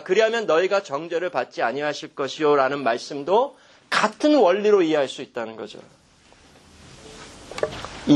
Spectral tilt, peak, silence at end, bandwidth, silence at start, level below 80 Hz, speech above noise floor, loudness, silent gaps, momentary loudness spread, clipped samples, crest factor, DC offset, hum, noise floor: -4.5 dB/octave; -4 dBFS; 0 s; 11 kHz; 0 s; -58 dBFS; 32 dB; -22 LUFS; none; 17 LU; under 0.1%; 18 dB; under 0.1%; none; -53 dBFS